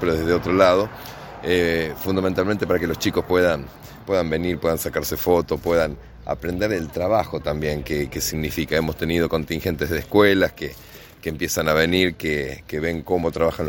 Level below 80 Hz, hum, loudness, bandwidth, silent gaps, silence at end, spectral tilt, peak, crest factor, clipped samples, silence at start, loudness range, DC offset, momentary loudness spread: -40 dBFS; none; -22 LUFS; 17 kHz; none; 0 s; -5 dB/octave; -2 dBFS; 20 dB; under 0.1%; 0 s; 2 LU; under 0.1%; 11 LU